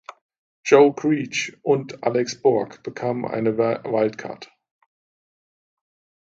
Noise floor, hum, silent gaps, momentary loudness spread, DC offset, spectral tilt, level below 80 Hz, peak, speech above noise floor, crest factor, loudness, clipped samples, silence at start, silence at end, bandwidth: under -90 dBFS; none; 0.21-0.29 s, 0.38-0.63 s; 17 LU; under 0.1%; -5.5 dB/octave; -68 dBFS; -2 dBFS; over 69 dB; 22 dB; -21 LUFS; under 0.1%; 0.1 s; 1.9 s; 7.8 kHz